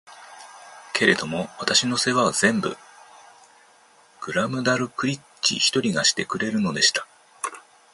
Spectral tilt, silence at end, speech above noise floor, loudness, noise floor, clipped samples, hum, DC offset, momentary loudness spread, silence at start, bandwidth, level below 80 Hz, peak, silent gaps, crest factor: -2.5 dB/octave; 0.35 s; 32 dB; -22 LUFS; -55 dBFS; under 0.1%; none; under 0.1%; 18 LU; 0.1 s; 12 kHz; -62 dBFS; 0 dBFS; none; 24 dB